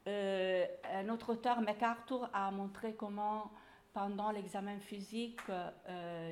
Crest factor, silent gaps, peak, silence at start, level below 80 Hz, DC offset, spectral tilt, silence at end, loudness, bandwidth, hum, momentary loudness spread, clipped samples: 18 dB; none; -22 dBFS; 0.05 s; -76 dBFS; under 0.1%; -6 dB/octave; 0 s; -40 LUFS; 15.5 kHz; none; 10 LU; under 0.1%